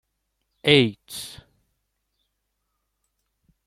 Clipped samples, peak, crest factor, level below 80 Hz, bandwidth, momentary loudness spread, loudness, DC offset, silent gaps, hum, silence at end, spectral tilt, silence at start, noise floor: under 0.1%; -2 dBFS; 26 dB; -62 dBFS; 16 kHz; 18 LU; -20 LUFS; under 0.1%; none; none; 2.35 s; -5 dB/octave; 0.65 s; -77 dBFS